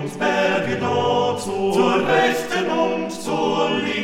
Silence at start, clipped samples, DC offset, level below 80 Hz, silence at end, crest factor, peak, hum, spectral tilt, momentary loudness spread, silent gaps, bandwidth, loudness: 0 s; under 0.1%; under 0.1%; -56 dBFS; 0 s; 16 dB; -4 dBFS; none; -4.5 dB/octave; 5 LU; none; 16.5 kHz; -20 LUFS